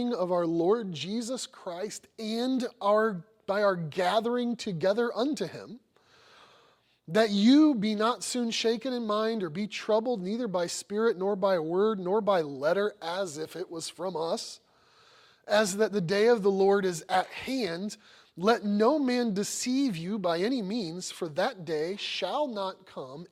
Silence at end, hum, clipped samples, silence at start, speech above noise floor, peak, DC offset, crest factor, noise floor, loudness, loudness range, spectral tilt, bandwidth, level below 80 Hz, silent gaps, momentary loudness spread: 0.05 s; none; under 0.1%; 0 s; 36 dB; -12 dBFS; under 0.1%; 18 dB; -64 dBFS; -28 LUFS; 5 LU; -4.5 dB/octave; 16 kHz; -74 dBFS; none; 12 LU